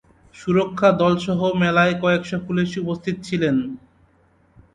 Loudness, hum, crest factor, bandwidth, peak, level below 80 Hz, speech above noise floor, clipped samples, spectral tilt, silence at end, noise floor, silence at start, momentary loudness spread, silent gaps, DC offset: -20 LUFS; none; 18 dB; 9.2 kHz; -4 dBFS; -52 dBFS; 39 dB; under 0.1%; -7 dB/octave; 0.95 s; -58 dBFS; 0.35 s; 9 LU; none; under 0.1%